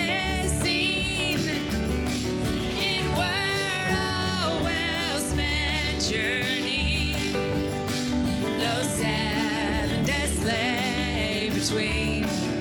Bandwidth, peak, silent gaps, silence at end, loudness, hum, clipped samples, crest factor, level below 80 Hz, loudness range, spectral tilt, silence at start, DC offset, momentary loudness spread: 19.5 kHz; -14 dBFS; none; 0 s; -25 LUFS; none; under 0.1%; 12 dB; -38 dBFS; 1 LU; -4 dB/octave; 0 s; under 0.1%; 3 LU